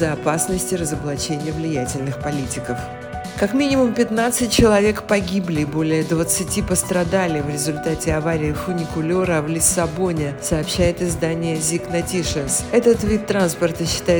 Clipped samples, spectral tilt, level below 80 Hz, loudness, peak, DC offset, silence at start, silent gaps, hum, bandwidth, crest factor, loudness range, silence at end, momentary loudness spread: under 0.1%; -4.5 dB/octave; -38 dBFS; -20 LUFS; -2 dBFS; under 0.1%; 0 s; none; none; over 20 kHz; 18 dB; 4 LU; 0 s; 7 LU